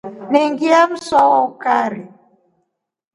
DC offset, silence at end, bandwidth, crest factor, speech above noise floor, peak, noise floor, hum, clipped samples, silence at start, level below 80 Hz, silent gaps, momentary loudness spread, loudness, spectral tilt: under 0.1%; 1.1 s; 11 kHz; 16 dB; 55 dB; 0 dBFS; -70 dBFS; none; under 0.1%; 0.05 s; -60 dBFS; none; 6 LU; -15 LUFS; -4.5 dB/octave